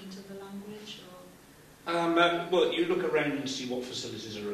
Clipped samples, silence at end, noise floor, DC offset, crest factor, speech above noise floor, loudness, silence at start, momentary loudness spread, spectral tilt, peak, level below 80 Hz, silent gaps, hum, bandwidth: under 0.1%; 0 s; -54 dBFS; under 0.1%; 20 dB; 26 dB; -29 LUFS; 0 s; 19 LU; -4.5 dB/octave; -12 dBFS; -68 dBFS; none; none; 14.5 kHz